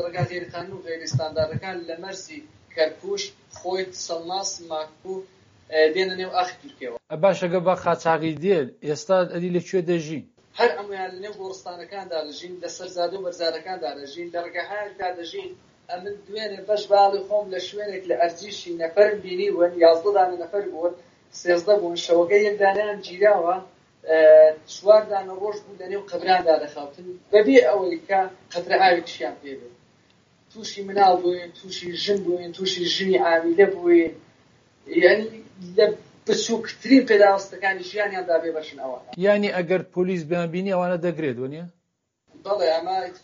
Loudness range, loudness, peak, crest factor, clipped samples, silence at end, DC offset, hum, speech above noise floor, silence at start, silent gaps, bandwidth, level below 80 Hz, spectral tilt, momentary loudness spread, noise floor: 10 LU; -22 LUFS; -2 dBFS; 20 dB; under 0.1%; 0.05 s; under 0.1%; none; 53 dB; 0 s; none; 7.4 kHz; -68 dBFS; -3.5 dB/octave; 17 LU; -75 dBFS